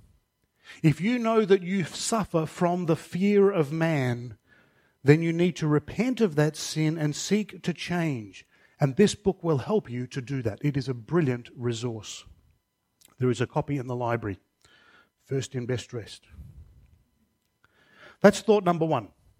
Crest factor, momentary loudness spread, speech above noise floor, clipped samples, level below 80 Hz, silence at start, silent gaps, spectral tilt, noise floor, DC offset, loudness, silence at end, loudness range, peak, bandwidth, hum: 24 dB; 12 LU; 47 dB; under 0.1%; -58 dBFS; 0.7 s; none; -6 dB/octave; -73 dBFS; under 0.1%; -26 LUFS; 0.35 s; 8 LU; -4 dBFS; 15 kHz; none